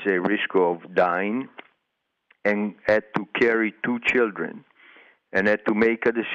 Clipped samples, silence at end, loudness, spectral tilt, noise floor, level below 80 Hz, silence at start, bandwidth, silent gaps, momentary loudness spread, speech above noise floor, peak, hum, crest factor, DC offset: under 0.1%; 0 s; -23 LUFS; -6.5 dB/octave; -78 dBFS; -64 dBFS; 0 s; 7.8 kHz; none; 7 LU; 55 dB; -8 dBFS; none; 16 dB; under 0.1%